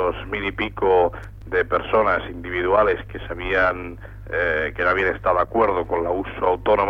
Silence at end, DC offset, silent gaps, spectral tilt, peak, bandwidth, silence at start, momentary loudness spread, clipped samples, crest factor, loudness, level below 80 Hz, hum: 0 s; under 0.1%; none; -7.5 dB/octave; -6 dBFS; 6.2 kHz; 0 s; 10 LU; under 0.1%; 16 dB; -21 LUFS; -40 dBFS; none